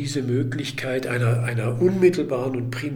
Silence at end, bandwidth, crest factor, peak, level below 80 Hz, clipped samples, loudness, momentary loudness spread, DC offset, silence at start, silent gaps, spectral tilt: 0 s; 15 kHz; 18 dB; -6 dBFS; -56 dBFS; under 0.1%; -23 LUFS; 8 LU; under 0.1%; 0 s; none; -6.5 dB/octave